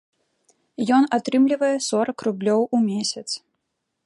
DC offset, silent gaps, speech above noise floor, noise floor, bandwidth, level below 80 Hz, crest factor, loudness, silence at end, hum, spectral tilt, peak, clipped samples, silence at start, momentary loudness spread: under 0.1%; none; 57 dB; -77 dBFS; 11.5 kHz; -72 dBFS; 16 dB; -21 LUFS; 0.7 s; none; -4.5 dB/octave; -6 dBFS; under 0.1%; 0.8 s; 11 LU